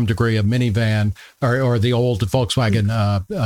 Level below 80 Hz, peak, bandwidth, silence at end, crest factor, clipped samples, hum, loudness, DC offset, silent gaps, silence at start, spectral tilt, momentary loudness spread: -44 dBFS; -4 dBFS; 14 kHz; 0 s; 14 dB; under 0.1%; none; -19 LUFS; under 0.1%; none; 0 s; -6.5 dB/octave; 3 LU